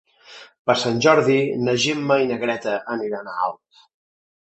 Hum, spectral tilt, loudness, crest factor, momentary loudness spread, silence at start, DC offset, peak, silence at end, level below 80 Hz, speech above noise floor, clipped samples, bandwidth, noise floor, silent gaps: none; -4.5 dB/octave; -20 LUFS; 20 dB; 10 LU; 0.3 s; under 0.1%; 0 dBFS; 1 s; -62 dBFS; 25 dB; under 0.1%; 8.4 kHz; -45 dBFS; 0.59-0.65 s